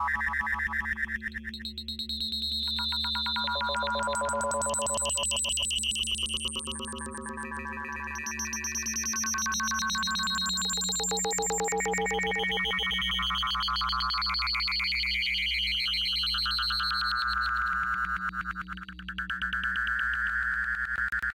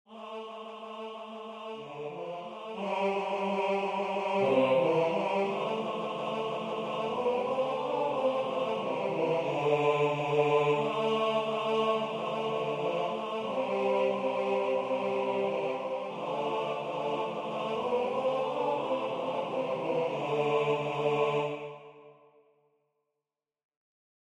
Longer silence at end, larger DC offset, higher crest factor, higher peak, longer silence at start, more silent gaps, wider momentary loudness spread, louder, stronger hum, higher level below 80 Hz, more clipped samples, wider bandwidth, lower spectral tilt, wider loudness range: second, 0 s vs 2.25 s; neither; second, 12 dB vs 18 dB; second, -18 dBFS vs -14 dBFS; about the same, 0 s vs 0.1 s; neither; second, 9 LU vs 13 LU; first, -28 LUFS vs -31 LUFS; neither; first, -46 dBFS vs -76 dBFS; neither; first, 17 kHz vs 10.5 kHz; second, -1 dB/octave vs -6 dB/octave; about the same, 4 LU vs 5 LU